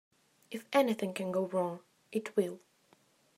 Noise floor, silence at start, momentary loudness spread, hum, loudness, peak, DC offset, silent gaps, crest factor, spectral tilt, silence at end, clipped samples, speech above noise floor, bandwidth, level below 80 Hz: -68 dBFS; 0.5 s; 16 LU; none; -34 LUFS; -16 dBFS; under 0.1%; none; 20 dB; -5.5 dB/octave; 0.8 s; under 0.1%; 35 dB; 16 kHz; -86 dBFS